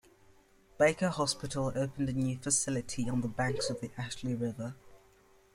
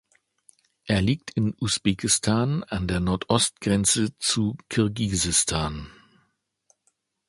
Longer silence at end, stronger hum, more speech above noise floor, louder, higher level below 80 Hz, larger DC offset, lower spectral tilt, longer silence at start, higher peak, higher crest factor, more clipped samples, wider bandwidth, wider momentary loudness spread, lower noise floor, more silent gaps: second, 0.6 s vs 1.4 s; neither; second, 31 dB vs 48 dB; second, -33 LUFS vs -24 LUFS; second, -58 dBFS vs -44 dBFS; neither; about the same, -4.5 dB/octave vs -4 dB/octave; about the same, 0.8 s vs 0.85 s; second, -14 dBFS vs -4 dBFS; about the same, 20 dB vs 22 dB; neither; first, 15.5 kHz vs 11.5 kHz; about the same, 9 LU vs 7 LU; second, -63 dBFS vs -72 dBFS; neither